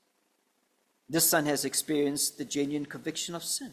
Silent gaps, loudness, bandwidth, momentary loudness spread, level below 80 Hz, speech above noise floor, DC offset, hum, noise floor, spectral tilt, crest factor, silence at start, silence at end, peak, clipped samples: none; -29 LUFS; 16 kHz; 10 LU; -72 dBFS; 44 dB; under 0.1%; none; -73 dBFS; -2.5 dB/octave; 20 dB; 1.1 s; 0 s; -10 dBFS; under 0.1%